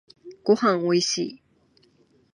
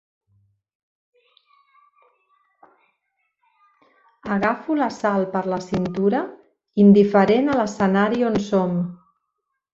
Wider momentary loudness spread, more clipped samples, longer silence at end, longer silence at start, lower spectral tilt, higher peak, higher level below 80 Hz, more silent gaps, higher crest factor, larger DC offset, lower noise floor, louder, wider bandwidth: about the same, 10 LU vs 12 LU; neither; first, 1 s vs 0.8 s; second, 0.25 s vs 4.25 s; second, -4 dB/octave vs -7.5 dB/octave; about the same, -6 dBFS vs -4 dBFS; second, -74 dBFS vs -58 dBFS; neither; about the same, 20 dB vs 18 dB; neither; second, -62 dBFS vs -78 dBFS; second, -23 LUFS vs -20 LUFS; first, 11 kHz vs 7.6 kHz